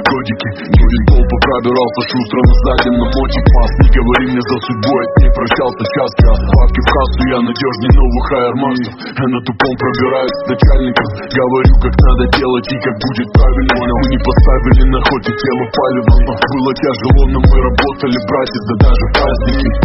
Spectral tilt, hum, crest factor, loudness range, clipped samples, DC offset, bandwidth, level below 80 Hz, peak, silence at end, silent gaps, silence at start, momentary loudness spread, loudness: -5.5 dB/octave; none; 10 dB; 2 LU; under 0.1%; under 0.1%; 6 kHz; -12 dBFS; 0 dBFS; 0 s; none; 0 s; 6 LU; -12 LUFS